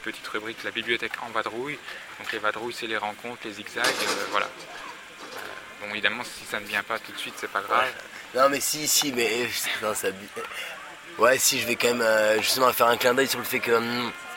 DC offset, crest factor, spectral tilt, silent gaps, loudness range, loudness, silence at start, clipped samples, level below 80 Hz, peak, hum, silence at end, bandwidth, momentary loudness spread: under 0.1%; 22 dB; -1.5 dB/octave; none; 8 LU; -25 LUFS; 0 s; under 0.1%; -66 dBFS; -4 dBFS; none; 0 s; 17 kHz; 16 LU